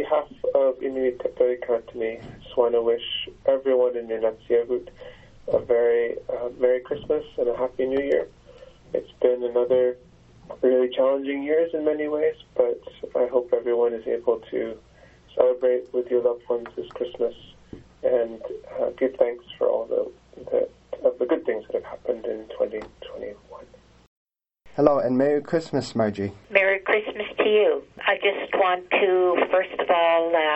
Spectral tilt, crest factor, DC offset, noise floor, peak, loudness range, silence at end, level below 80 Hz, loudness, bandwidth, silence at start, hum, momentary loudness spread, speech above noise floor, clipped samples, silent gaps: -6 dB/octave; 22 dB; under 0.1%; -53 dBFS; -2 dBFS; 5 LU; 0 s; -58 dBFS; -24 LUFS; 8.2 kHz; 0 s; none; 11 LU; 29 dB; under 0.1%; 24.07-24.26 s